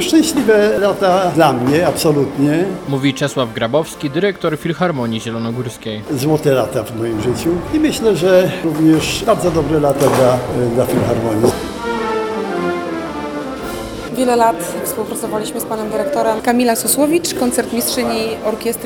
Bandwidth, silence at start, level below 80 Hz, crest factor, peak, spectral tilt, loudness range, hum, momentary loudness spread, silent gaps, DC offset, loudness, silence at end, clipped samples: 19.5 kHz; 0 s; -42 dBFS; 16 dB; 0 dBFS; -5 dB/octave; 5 LU; none; 9 LU; none; under 0.1%; -16 LUFS; 0 s; under 0.1%